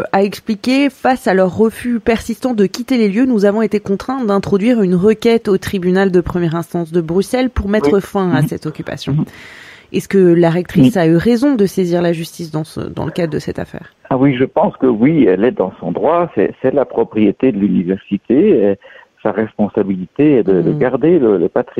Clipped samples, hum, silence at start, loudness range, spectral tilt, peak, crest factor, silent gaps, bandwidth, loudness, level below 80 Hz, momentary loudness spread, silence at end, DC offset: under 0.1%; none; 0 s; 3 LU; -7.5 dB/octave; 0 dBFS; 14 dB; none; 15 kHz; -14 LUFS; -40 dBFS; 10 LU; 0 s; under 0.1%